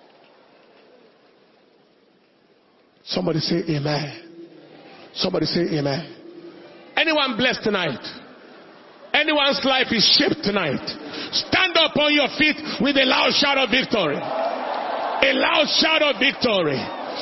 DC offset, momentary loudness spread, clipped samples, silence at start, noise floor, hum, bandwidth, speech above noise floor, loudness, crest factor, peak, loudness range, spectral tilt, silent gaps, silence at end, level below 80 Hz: under 0.1%; 12 LU; under 0.1%; 3.05 s; -58 dBFS; none; 6 kHz; 37 dB; -19 LUFS; 20 dB; -2 dBFS; 9 LU; -4.5 dB/octave; none; 0 s; -56 dBFS